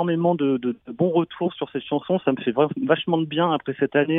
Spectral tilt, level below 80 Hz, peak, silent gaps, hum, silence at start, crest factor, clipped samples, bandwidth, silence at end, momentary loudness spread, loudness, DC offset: -10 dB/octave; -66 dBFS; -6 dBFS; none; none; 0 s; 16 dB; under 0.1%; 3.9 kHz; 0 s; 6 LU; -23 LUFS; under 0.1%